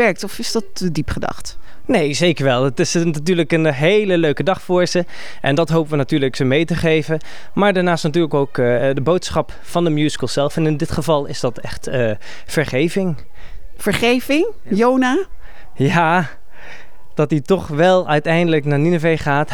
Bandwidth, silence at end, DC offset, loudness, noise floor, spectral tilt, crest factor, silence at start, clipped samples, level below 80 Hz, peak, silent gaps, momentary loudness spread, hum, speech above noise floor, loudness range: 18 kHz; 0 s; 4%; -17 LUFS; -41 dBFS; -5.5 dB/octave; 18 dB; 0 s; under 0.1%; -42 dBFS; 0 dBFS; none; 9 LU; none; 24 dB; 3 LU